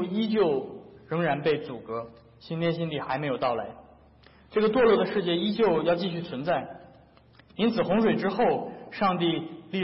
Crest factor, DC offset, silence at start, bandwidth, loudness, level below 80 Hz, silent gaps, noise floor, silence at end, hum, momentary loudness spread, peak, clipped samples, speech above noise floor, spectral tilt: 16 dB; under 0.1%; 0 s; 5.8 kHz; -27 LUFS; -60 dBFS; none; -56 dBFS; 0 s; none; 13 LU; -12 dBFS; under 0.1%; 30 dB; -10.5 dB/octave